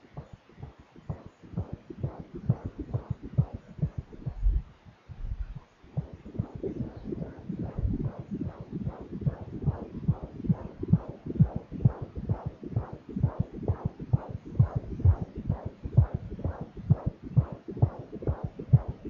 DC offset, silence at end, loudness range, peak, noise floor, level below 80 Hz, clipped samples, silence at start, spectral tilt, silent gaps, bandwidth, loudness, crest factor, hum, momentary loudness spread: under 0.1%; 0 s; 8 LU; -8 dBFS; -51 dBFS; -40 dBFS; under 0.1%; 0.15 s; -11.5 dB/octave; none; 4.4 kHz; -32 LUFS; 22 dB; none; 14 LU